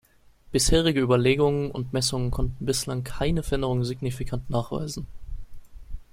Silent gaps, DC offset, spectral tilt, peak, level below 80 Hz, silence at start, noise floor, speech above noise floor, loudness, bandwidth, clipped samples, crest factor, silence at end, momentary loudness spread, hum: none; under 0.1%; -5 dB/octave; -8 dBFS; -36 dBFS; 0.5 s; -52 dBFS; 28 dB; -25 LUFS; 16.5 kHz; under 0.1%; 18 dB; 0.1 s; 19 LU; none